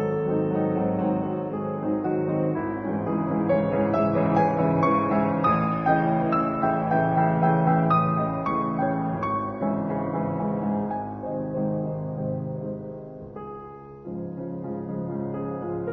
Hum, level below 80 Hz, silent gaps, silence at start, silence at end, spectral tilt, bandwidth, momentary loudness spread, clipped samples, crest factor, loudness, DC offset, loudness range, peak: none; -54 dBFS; none; 0 s; 0 s; -10.5 dB/octave; 5.2 kHz; 12 LU; under 0.1%; 16 dB; -25 LUFS; under 0.1%; 10 LU; -10 dBFS